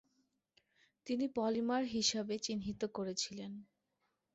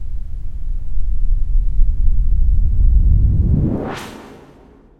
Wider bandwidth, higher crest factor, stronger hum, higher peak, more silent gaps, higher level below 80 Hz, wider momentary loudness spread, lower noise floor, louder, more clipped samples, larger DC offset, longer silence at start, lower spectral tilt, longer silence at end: first, 8 kHz vs 4.2 kHz; first, 22 dB vs 12 dB; neither; second, -18 dBFS vs -2 dBFS; neither; second, -70 dBFS vs -16 dBFS; about the same, 14 LU vs 15 LU; first, -84 dBFS vs -45 dBFS; second, -38 LUFS vs -20 LUFS; neither; neither; first, 1.05 s vs 0 s; second, -3.5 dB/octave vs -8.5 dB/octave; about the same, 0.7 s vs 0.65 s